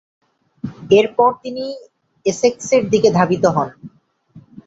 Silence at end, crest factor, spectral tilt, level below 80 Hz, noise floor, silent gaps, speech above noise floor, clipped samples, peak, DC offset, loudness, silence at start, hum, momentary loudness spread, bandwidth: 0.05 s; 16 dB; -5.5 dB/octave; -56 dBFS; -46 dBFS; none; 30 dB; under 0.1%; -2 dBFS; under 0.1%; -16 LUFS; 0.65 s; none; 17 LU; 8 kHz